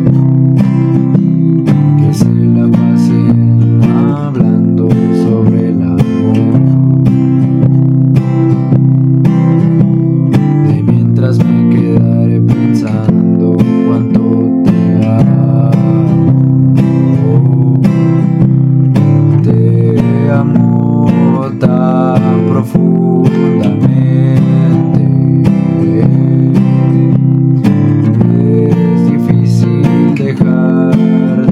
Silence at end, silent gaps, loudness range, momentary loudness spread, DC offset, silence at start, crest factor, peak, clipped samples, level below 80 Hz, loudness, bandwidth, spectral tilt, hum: 0 s; none; 1 LU; 2 LU; under 0.1%; 0 s; 8 dB; 0 dBFS; under 0.1%; -42 dBFS; -9 LUFS; 6.8 kHz; -10 dB/octave; none